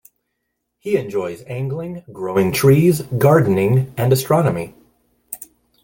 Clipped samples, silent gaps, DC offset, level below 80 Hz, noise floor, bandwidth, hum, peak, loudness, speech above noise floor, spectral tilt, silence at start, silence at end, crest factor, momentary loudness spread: under 0.1%; none; under 0.1%; -52 dBFS; -75 dBFS; 17 kHz; none; -2 dBFS; -17 LUFS; 58 dB; -7 dB/octave; 0.85 s; 0.4 s; 16 dB; 19 LU